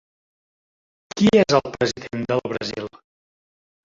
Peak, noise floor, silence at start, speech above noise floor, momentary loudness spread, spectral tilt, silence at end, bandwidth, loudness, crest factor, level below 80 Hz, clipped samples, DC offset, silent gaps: -2 dBFS; under -90 dBFS; 1.15 s; over 70 dB; 17 LU; -5.5 dB/octave; 1 s; 7.6 kHz; -21 LUFS; 20 dB; -56 dBFS; under 0.1%; under 0.1%; none